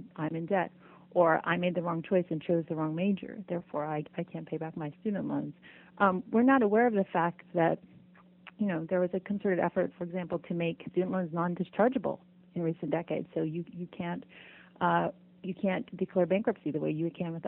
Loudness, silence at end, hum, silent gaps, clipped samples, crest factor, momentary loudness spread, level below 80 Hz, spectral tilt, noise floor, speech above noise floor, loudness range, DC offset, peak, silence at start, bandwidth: -31 LUFS; 0 s; none; none; under 0.1%; 20 dB; 12 LU; -72 dBFS; -11 dB/octave; -58 dBFS; 27 dB; 5 LU; under 0.1%; -10 dBFS; 0 s; 4 kHz